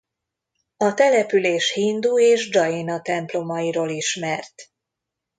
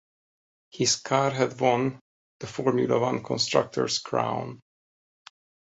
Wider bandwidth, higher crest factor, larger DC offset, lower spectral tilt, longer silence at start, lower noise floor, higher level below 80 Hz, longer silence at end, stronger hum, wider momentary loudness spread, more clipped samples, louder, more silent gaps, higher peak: first, 9.4 kHz vs 8.4 kHz; about the same, 18 dB vs 22 dB; neither; about the same, -3.5 dB/octave vs -4 dB/octave; about the same, 0.8 s vs 0.75 s; second, -83 dBFS vs under -90 dBFS; second, -72 dBFS vs -66 dBFS; second, 0.75 s vs 1.2 s; neither; about the same, 9 LU vs 8 LU; neither; first, -20 LUFS vs -26 LUFS; second, none vs 2.01-2.40 s; about the same, -4 dBFS vs -4 dBFS